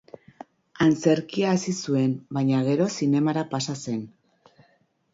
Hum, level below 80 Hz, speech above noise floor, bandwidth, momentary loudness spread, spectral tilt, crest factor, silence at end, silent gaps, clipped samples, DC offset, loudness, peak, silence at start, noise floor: none; -64 dBFS; 42 dB; 7.8 kHz; 9 LU; -6 dB/octave; 18 dB; 1.05 s; none; under 0.1%; under 0.1%; -24 LUFS; -6 dBFS; 0.75 s; -65 dBFS